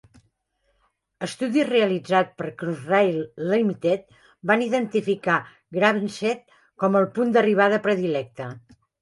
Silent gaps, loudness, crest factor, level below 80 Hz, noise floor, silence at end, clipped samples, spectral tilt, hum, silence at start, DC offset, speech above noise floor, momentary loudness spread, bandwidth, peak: none; -23 LUFS; 20 dB; -68 dBFS; -71 dBFS; 0.45 s; under 0.1%; -6 dB/octave; none; 1.2 s; under 0.1%; 49 dB; 12 LU; 11.5 kHz; -4 dBFS